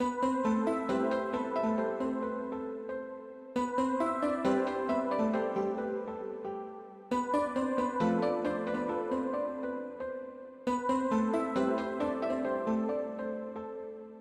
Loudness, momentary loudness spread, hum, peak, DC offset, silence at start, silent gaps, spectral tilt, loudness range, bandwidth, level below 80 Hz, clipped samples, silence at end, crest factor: -33 LUFS; 10 LU; none; -18 dBFS; under 0.1%; 0 s; none; -6.5 dB/octave; 2 LU; 11 kHz; -64 dBFS; under 0.1%; 0 s; 14 dB